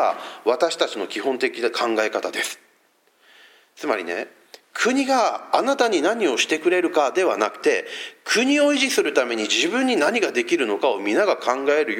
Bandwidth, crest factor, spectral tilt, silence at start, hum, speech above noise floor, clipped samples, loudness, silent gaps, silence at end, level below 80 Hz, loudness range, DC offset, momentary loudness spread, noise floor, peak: 16.5 kHz; 18 dB; -2 dB/octave; 0 s; none; 41 dB; under 0.1%; -21 LUFS; none; 0 s; -86 dBFS; 6 LU; under 0.1%; 7 LU; -62 dBFS; -2 dBFS